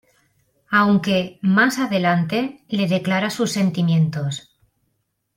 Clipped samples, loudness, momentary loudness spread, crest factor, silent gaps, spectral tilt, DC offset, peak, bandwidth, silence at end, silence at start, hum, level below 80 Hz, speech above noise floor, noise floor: under 0.1%; -19 LUFS; 8 LU; 18 dB; none; -6 dB/octave; under 0.1%; -2 dBFS; 16.5 kHz; 0.95 s; 0.7 s; none; -62 dBFS; 53 dB; -72 dBFS